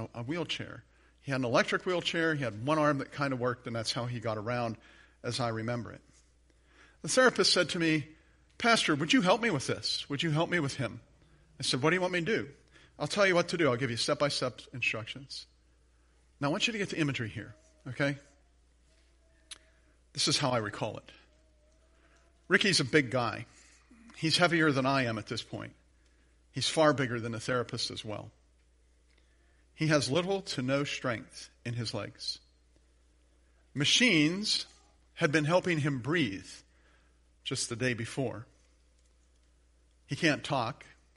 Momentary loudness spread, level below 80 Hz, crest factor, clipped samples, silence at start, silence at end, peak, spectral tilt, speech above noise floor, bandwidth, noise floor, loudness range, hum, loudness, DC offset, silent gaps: 18 LU; -64 dBFS; 24 dB; under 0.1%; 0 s; 0.45 s; -8 dBFS; -4 dB/octave; 35 dB; 11.5 kHz; -66 dBFS; 7 LU; none; -30 LUFS; under 0.1%; none